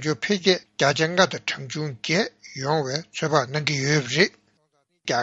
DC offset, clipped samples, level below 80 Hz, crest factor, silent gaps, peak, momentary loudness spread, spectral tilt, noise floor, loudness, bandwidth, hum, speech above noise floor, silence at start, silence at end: under 0.1%; under 0.1%; -64 dBFS; 22 dB; none; -2 dBFS; 9 LU; -4 dB/octave; -69 dBFS; -23 LUFS; 8 kHz; none; 46 dB; 0 s; 0 s